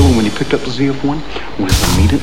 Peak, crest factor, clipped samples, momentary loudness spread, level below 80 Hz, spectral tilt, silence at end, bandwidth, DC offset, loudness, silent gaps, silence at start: 0 dBFS; 14 dB; under 0.1%; 9 LU; -22 dBFS; -5.5 dB/octave; 0 s; 16.5 kHz; 8%; -15 LUFS; none; 0 s